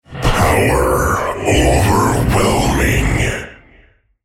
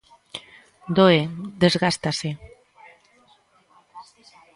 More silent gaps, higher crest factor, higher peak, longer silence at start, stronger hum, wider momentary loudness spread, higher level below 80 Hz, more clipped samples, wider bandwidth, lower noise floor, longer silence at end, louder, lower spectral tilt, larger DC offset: neither; second, 14 dB vs 22 dB; about the same, 0 dBFS vs -2 dBFS; second, 0.1 s vs 0.35 s; neither; second, 5 LU vs 22 LU; first, -22 dBFS vs -58 dBFS; neither; first, 16.5 kHz vs 11.5 kHz; second, -50 dBFS vs -59 dBFS; first, 0.7 s vs 0.55 s; first, -14 LUFS vs -21 LUFS; about the same, -5 dB/octave vs -5.5 dB/octave; neither